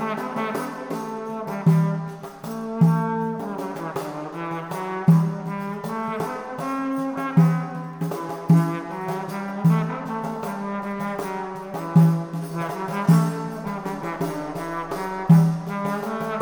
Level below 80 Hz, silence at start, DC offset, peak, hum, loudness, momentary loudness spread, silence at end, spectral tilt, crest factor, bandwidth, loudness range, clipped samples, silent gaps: -58 dBFS; 0 s; under 0.1%; -4 dBFS; none; -24 LUFS; 12 LU; 0 s; -8 dB/octave; 18 dB; 19.5 kHz; 3 LU; under 0.1%; none